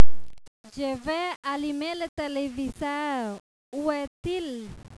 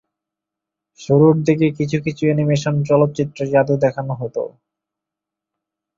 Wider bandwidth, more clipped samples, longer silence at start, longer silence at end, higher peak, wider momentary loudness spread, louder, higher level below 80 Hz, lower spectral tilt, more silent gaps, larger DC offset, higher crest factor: first, 11 kHz vs 7.6 kHz; neither; second, 0 s vs 1 s; second, 0 s vs 1.5 s; about the same, -2 dBFS vs -2 dBFS; second, 7 LU vs 12 LU; second, -31 LUFS vs -17 LUFS; first, -48 dBFS vs -56 dBFS; second, -5 dB/octave vs -7.5 dB/octave; first, 0.48-0.64 s, 1.36-1.43 s, 2.09-2.17 s, 3.40-3.72 s, 4.07-4.23 s vs none; neither; about the same, 20 dB vs 16 dB